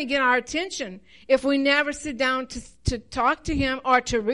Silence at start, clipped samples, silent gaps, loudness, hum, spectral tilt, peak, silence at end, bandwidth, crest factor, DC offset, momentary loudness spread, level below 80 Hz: 0 s; under 0.1%; none; -23 LUFS; none; -4 dB/octave; -8 dBFS; 0 s; 11.5 kHz; 16 dB; 0.2%; 10 LU; -40 dBFS